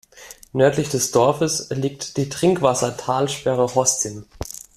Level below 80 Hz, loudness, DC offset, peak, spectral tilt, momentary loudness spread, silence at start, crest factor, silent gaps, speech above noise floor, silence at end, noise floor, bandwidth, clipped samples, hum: -50 dBFS; -20 LUFS; under 0.1%; -2 dBFS; -4 dB/octave; 11 LU; 0.15 s; 18 dB; none; 24 dB; 0.15 s; -44 dBFS; 15 kHz; under 0.1%; none